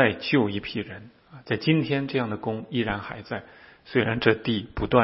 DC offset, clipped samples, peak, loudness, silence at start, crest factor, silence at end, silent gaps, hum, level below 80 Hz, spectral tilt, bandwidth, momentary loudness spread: under 0.1%; under 0.1%; -2 dBFS; -26 LUFS; 0 s; 22 dB; 0 s; none; none; -48 dBFS; -10 dB/octave; 5.8 kHz; 12 LU